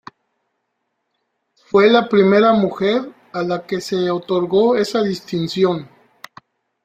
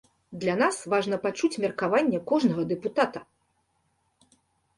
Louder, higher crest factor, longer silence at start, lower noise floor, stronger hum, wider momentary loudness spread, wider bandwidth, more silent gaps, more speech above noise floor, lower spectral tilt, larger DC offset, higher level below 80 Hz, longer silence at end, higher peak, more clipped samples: first, -17 LUFS vs -26 LUFS; about the same, 18 dB vs 20 dB; first, 1.75 s vs 0.3 s; about the same, -73 dBFS vs -72 dBFS; neither; first, 10 LU vs 5 LU; first, 14 kHz vs 11.5 kHz; neither; first, 57 dB vs 46 dB; about the same, -6 dB/octave vs -5.5 dB/octave; neither; first, -60 dBFS vs -68 dBFS; second, 1 s vs 1.55 s; first, -2 dBFS vs -8 dBFS; neither